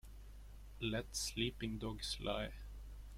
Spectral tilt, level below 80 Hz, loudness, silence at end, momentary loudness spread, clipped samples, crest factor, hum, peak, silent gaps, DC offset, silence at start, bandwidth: -3.5 dB/octave; -52 dBFS; -42 LUFS; 0 s; 18 LU; under 0.1%; 20 dB; none; -24 dBFS; none; under 0.1%; 0.05 s; 16.5 kHz